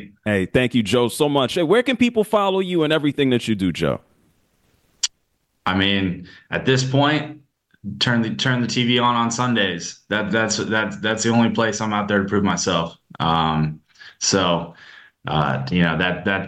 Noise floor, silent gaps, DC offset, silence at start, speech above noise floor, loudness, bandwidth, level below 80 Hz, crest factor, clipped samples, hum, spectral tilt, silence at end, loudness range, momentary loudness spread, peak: -69 dBFS; none; under 0.1%; 0 s; 49 dB; -20 LUFS; 12.5 kHz; -50 dBFS; 16 dB; under 0.1%; none; -4.5 dB/octave; 0 s; 4 LU; 8 LU; -4 dBFS